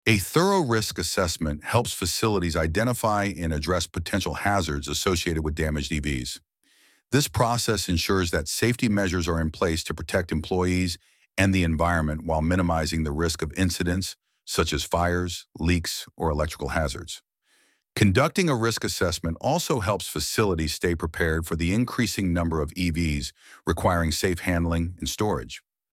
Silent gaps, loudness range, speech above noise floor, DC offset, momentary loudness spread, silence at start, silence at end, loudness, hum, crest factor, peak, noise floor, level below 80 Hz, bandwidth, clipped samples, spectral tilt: none; 2 LU; 41 dB; under 0.1%; 7 LU; 0.05 s; 0.35 s; -25 LUFS; none; 20 dB; -6 dBFS; -65 dBFS; -38 dBFS; 16.5 kHz; under 0.1%; -4.5 dB/octave